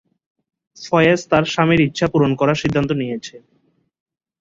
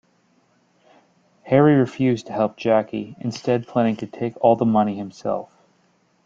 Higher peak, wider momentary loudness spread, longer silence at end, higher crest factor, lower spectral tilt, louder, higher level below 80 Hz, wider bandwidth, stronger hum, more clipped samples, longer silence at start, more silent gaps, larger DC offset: about the same, -2 dBFS vs -2 dBFS; about the same, 12 LU vs 12 LU; first, 1.05 s vs 0.8 s; about the same, 18 dB vs 20 dB; second, -6 dB/octave vs -8 dB/octave; first, -17 LUFS vs -21 LUFS; first, -48 dBFS vs -62 dBFS; about the same, 7.8 kHz vs 7.6 kHz; neither; neither; second, 0.8 s vs 1.45 s; neither; neither